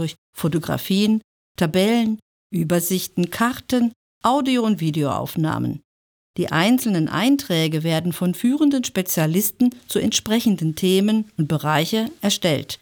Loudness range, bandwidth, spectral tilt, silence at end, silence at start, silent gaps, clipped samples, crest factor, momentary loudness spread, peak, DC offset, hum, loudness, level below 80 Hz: 2 LU; over 20 kHz; -5 dB/octave; 0.05 s; 0 s; 0.18-0.33 s, 1.24-1.55 s, 2.22-2.50 s, 3.96-4.21 s, 5.84-6.34 s; under 0.1%; 16 dB; 7 LU; -4 dBFS; under 0.1%; none; -21 LUFS; -58 dBFS